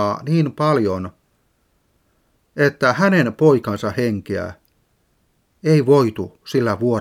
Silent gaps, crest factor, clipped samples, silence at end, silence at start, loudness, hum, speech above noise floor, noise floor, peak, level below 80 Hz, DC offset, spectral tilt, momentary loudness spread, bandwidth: none; 18 dB; under 0.1%; 0 s; 0 s; -18 LUFS; none; 46 dB; -64 dBFS; -2 dBFS; -58 dBFS; under 0.1%; -7 dB/octave; 12 LU; 15.5 kHz